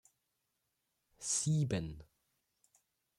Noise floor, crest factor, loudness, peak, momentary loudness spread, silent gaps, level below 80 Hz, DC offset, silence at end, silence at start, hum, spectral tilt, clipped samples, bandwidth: -84 dBFS; 18 dB; -35 LUFS; -24 dBFS; 15 LU; none; -64 dBFS; under 0.1%; 1.15 s; 1.2 s; none; -4.5 dB/octave; under 0.1%; 12.5 kHz